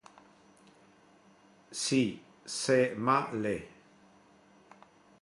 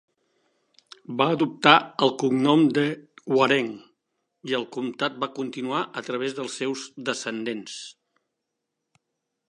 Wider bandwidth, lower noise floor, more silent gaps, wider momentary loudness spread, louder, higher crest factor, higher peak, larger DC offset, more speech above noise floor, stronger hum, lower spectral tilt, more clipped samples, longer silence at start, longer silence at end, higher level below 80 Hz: about the same, 11.5 kHz vs 11 kHz; second, -62 dBFS vs -82 dBFS; neither; about the same, 15 LU vs 16 LU; second, -31 LUFS vs -24 LUFS; about the same, 20 dB vs 24 dB; second, -14 dBFS vs -2 dBFS; neither; second, 32 dB vs 58 dB; neither; about the same, -4 dB/octave vs -4.5 dB/octave; neither; first, 1.7 s vs 1.1 s; about the same, 1.55 s vs 1.55 s; first, -70 dBFS vs -78 dBFS